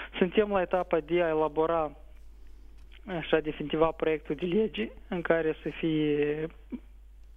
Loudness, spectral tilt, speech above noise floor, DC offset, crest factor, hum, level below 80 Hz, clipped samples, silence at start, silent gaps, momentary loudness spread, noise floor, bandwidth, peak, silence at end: -29 LUFS; -8.5 dB/octave; 20 dB; under 0.1%; 20 dB; none; -50 dBFS; under 0.1%; 0 s; none; 10 LU; -48 dBFS; 4.5 kHz; -10 dBFS; 0.1 s